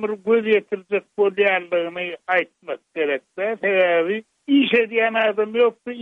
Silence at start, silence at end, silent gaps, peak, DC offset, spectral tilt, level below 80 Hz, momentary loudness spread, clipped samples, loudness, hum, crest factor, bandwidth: 0 s; 0 s; none; -6 dBFS; under 0.1%; -6.5 dB/octave; -74 dBFS; 9 LU; under 0.1%; -20 LUFS; none; 14 dB; 4.2 kHz